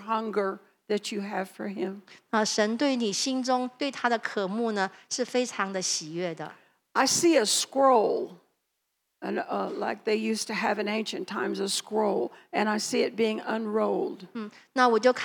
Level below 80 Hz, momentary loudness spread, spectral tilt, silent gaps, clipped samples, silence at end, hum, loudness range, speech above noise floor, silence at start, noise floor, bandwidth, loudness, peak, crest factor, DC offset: under -90 dBFS; 12 LU; -3 dB/octave; none; under 0.1%; 0 s; none; 4 LU; 52 dB; 0 s; -79 dBFS; 19 kHz; -27 LUFS; -8 dBFS; 20 dB; under 0.1%